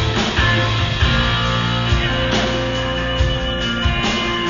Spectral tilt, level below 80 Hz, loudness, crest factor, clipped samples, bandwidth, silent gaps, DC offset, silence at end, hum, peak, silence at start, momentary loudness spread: -5 dB/octave; -26 dBFS; -17 LUFS; 14 dB; under 0.1%; 7.4 kHz; none; 0.4%; 0 s; none; -4 dBFS; 0 s; 4 LU